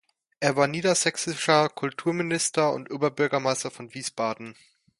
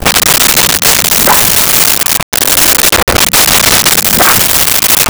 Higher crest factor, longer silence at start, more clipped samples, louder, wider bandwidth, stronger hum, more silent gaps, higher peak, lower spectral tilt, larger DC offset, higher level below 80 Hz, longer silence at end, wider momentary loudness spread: first, 22 dB vs 8 dB; first, 0.4 s vs 0 s; second, under 0.1% vs 0.2%; second, -25 LUFS vs -5 LUFS; second, 11.5 kHz vs over 20 kHz; neither; second, none vs 2.23-2.32 s, 3.03-3.07 s; second, -4 dBFS vs 0 dBFS; first, -3.5 dB/octave vs -1 dB/octave; neither; second, -70 dBFS vs -28 dBFS; first, 0.5 s vs 0 s; first, 11 LU vs 2 LU